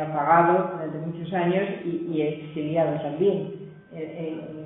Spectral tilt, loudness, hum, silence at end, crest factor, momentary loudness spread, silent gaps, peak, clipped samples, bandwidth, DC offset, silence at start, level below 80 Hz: -11.5 dB/octave; -25 LUFS; none; 0 s; 20 dB; 16 LU; none; -6 dBFS; under 0.1%; 3.9 kHz; under 0.1%; 0 s; -66 dBFS